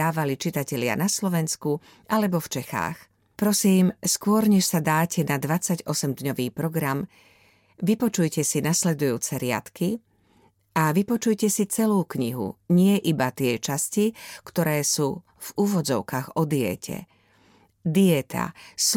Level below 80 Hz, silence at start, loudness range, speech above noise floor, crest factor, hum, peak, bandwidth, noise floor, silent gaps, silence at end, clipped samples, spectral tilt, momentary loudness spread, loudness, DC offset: -62 dBFS; 0 s; 4 LU; 37 dB; 16 dB; none; -8 dBFS; 17.5 kHz; -61 dBFS; none; 0 s; under 0.1%; -4.5 dB/octave; 10 LU; -24 LUFS; under 0.1%